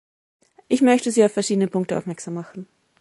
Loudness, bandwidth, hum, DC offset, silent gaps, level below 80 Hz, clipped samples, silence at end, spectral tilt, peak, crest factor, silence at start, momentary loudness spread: -21 LUFS; 11.5 kHz; none; under 0.1%; none; -68 dBFS; under 0.1%; 0.35 s; -5 dB/octave; -4 dBFS; 18 dB; 0.7 s; 15 LU